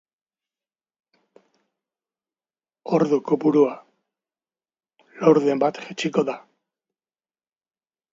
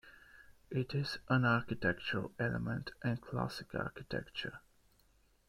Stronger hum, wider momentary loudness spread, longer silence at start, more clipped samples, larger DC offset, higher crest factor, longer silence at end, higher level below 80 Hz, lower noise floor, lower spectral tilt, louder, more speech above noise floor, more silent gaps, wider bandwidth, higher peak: neither; first, 13 LU vs 10 LU; first, 2.85 s vs 0.05 s; neither; neither; about the same, 22 dB vs 22 dB; first, 1.75 s vs 0.9 s; second, -74 dBFS vs -60 dBFS; first, under -90 dBFS vs -70 dBFS; about the same, -6.5 dB/octave vs -7 dB/octave; first, -21 LUFS vs -37 LUFS; first, over 70 dB vs 33 dB; neither; second, 7.8 kHz vs 14 kHz; first, -2 dBFS vs -16 dBFS